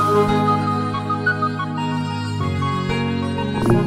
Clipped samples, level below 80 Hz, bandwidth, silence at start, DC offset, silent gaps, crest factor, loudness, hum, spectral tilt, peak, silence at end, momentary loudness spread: under 0.1%; -42 dBFS; 15.5 kHz; 0 s; under 0.1%; none; 16 dB; -21 LUFS; none; -7 dB/octave; -4 dBFS; 0 s; 6 LU